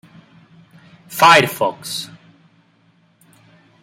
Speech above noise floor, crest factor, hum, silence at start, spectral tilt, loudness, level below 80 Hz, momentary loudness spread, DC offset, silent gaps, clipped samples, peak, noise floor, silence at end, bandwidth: 42 dB; 20 dB; none; 1.1 s; -3 dB/octave; -14 LUFS; -68 dBFS; 20 LU; under 0.1%; none; under 0.1%; 0 dBFS; -57 dBFS; 1.75 s; 16.5 kHz